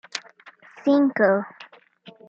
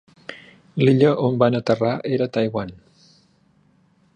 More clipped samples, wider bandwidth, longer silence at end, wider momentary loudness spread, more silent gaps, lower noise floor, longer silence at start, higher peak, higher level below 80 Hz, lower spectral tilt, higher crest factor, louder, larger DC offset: neither; second, 7.8 kHz vs 9.2 kHz; second, 0.2 s vs 1.4 s; second, 16 LU vs 21 LU; neither; second, -50 dBFS vs -59 dBFS; second, 0.15 s vs 0.3 s; about the same, -6 dBFS vs -4 dBFS; second, -78 dBFS vs -58 dBFS; second, -5.5 dB/octave vs -8 dB/octave; about the same, 20 dB vs 18 dB; about the same, -21 LUFS vs -20 LUFS; neither